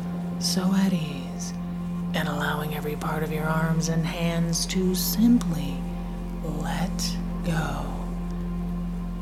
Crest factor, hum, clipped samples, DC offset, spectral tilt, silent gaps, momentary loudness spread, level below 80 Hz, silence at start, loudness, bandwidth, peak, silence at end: 16 dB; none; under 0.1%; under 0.1%; -5 dB/octave; none; 9 LU; -36 dBFS; 0 s; -27 LUFS; 15.5 kHz; -10 dBFS; 0 s